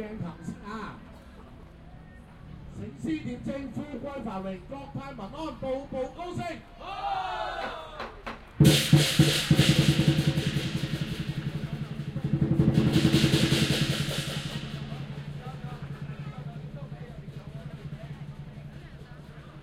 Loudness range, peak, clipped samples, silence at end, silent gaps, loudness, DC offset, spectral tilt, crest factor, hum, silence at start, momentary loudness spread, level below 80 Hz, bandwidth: 16 LU; -6 dBFS; under 0.1%; 0 s; none; -28 LUFS; under 0.1%; -5.5 dB/octave; 22 dB; none; 0 s; 22 LU; -46 dBFS; 16 kHz